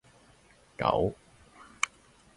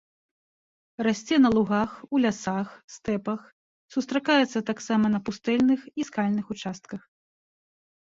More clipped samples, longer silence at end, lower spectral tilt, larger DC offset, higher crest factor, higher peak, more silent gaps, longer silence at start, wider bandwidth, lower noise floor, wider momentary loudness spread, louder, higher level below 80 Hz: neither; second, 0.5 s vs 1.15 s; second, -4 dB/octave vs -5.5 dB/octave; neither; first, 26 dB vs 18 dB; about the same, -8 dBFS vs -8 dBFS; second, none vs 2.84-2.88 s, 3.52-3.88 s; second, 0.8 s vs 1 s; first, 11.5 kHz vs 7.8 kHz; second, -60 dBFS vs under -90 dBFS; first, 22 LU vs 14 LU; second, -31 LUFS vs -26 LUFS; first, -54 dBFS vs -62 dBFS